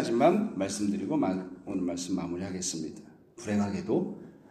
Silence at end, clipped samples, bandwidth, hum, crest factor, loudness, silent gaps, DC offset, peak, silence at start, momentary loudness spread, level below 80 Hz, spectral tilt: 0.15 s; under 0.1%; 13 kHz; none; 20 dB; -31 LUFS; none; under 0.1%; -10 dBFS; 0 s; 13 LU; -64 dBFS; -5.5 dB/octave